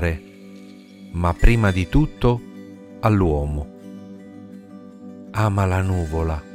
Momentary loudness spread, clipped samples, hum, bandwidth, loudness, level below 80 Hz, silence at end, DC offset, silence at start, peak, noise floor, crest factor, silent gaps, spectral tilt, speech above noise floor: 23 LU; under 0.1%; none; 14.5 kHz; -21 LUFS; -28 dBFS; 0 s; under 0.1%; 0 s; -2 dBFS; -42 dBFS; 20 dB; none; -7.5 dB/octave; 24 dB